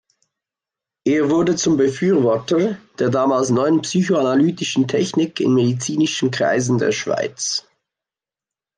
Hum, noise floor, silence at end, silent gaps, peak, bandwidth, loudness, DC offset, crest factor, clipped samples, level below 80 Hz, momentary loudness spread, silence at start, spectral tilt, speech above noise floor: none; -89 dBFS; 1.15 s; none; -6 dBFS; 10 kHz; -18 LUFS; under 0.1%; 12 dB; under 0.1%; -62 dBFS; 5 LU; 1.05 s; -5 dB/octave; 72 dB